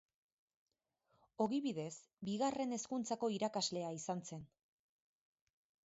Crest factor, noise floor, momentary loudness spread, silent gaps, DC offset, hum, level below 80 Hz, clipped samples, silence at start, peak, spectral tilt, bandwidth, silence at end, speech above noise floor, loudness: 20 dB; -82 dBFS; 10 LU; none; under 0.1%; none; -82 dBFS; under 0.1%; 1.4 s; -24 dBFS; -5 dB/octave; 8 kHz; 1.4 s; 41 dB; -41 LUFS